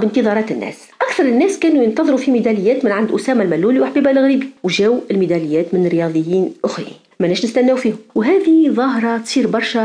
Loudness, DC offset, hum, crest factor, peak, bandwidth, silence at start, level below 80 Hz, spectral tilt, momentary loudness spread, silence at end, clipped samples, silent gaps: -15 LUFS; under 0.1%; none; 12 dB; -4 dBFS; 10.5 kHz; 0 s; -62 dBFS; -6 dB/octave; 7 LU; 0 s; under 0.1%; none